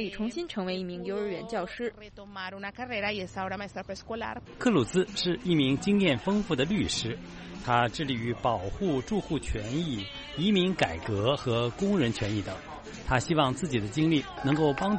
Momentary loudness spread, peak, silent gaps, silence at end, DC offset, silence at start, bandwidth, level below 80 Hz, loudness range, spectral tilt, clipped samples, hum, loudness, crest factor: 12 LU; -8 dBFS; none; 0 s; under 0.1%; 0 s; 8.8 kHz; -48 dBFS; 7 LU; -5.5 dB/octave; under 0.1%; none; -29 LUFS; 20 dB